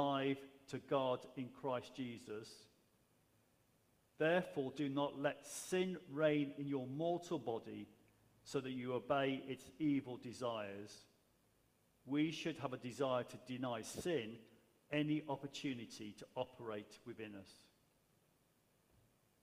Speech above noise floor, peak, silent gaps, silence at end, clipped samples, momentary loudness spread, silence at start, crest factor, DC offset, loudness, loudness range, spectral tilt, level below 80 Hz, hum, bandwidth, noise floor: 35 dB; -22 dBFS; none; 1.9 s; under 0.1%; 14 LU; 0 s; 22 dB; under 0.1%; -43 LUFS; 7 LU; -5.5 dB/octave; -82 dBFS; none; 15.5 kHz; -77 dBFS